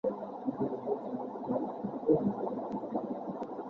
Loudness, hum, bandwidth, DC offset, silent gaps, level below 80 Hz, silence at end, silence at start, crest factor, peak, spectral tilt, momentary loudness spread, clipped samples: -35 LUFS; none; 6.2 kHz; under 0.1%; none; -68 dBFS; 0 s; 0.05 s; 20 dB; -14 dBFS; -10.5 dB/octave; 9 LU; under 0.1%